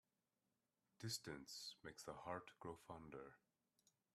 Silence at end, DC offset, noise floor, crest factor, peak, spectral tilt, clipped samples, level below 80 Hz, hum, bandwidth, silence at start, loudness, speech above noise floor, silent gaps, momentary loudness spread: 0.75 s; under 0.1%; under -90 dBFS; 22 dB; -34 dBFS; -3.5 dB/octave; under 0.1%; -82 dBFS; none; 14 kHz; 1 s; -54 LUFS; over 35 dB; none; 9 LU